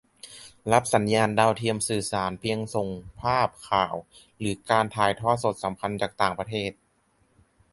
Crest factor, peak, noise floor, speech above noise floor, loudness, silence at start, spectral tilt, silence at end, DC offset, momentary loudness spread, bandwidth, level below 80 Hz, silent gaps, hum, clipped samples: 22 dB; -6 dBFS; -67 dBFS; 41 dB; -26 LUFS; 0.25 s; -4.5 dB/octave; 1 s; under 0.1%; 12 LU; 12 kHz; -54 dBFS; none; none; under 0.1%